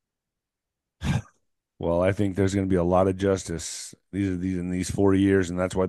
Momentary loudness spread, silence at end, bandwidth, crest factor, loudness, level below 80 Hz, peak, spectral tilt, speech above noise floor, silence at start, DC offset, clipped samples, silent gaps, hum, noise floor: 11 LU; 0 s; 12.5 kHz; 18 dB; -25 LUFS; -48 dBFS; -8 dBFS; -6.5 dB/octave; 62 dB; 1 s; under 0.1%; under 0.1%; none; none; -86 dBFS